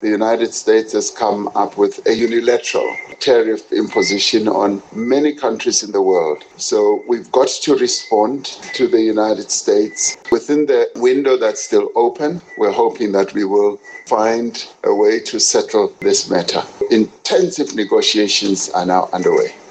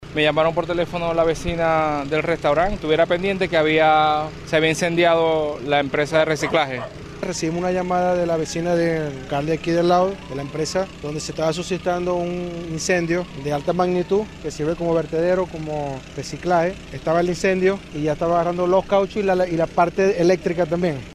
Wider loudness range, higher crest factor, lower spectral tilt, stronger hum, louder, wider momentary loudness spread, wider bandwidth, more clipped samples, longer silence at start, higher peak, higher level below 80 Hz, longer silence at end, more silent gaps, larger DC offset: second, 1 LU vs 4 LU; about the same, 14 dB vs 14 dB; second, -3 dB/octave vs -5.5 dB/octave; neither; first, -16 LUFS vs -21 LUFS; second, 5 LU vs 9 LU; second, 9.2 kHz vs 13.5 kHz; neither; about the same, 0 s vs 0 s; first, -2 dBFS vs -6 dBFS; second, -60 dBFS vs -42 dBFS; first, 0.15 s vs 0 s; neither; neither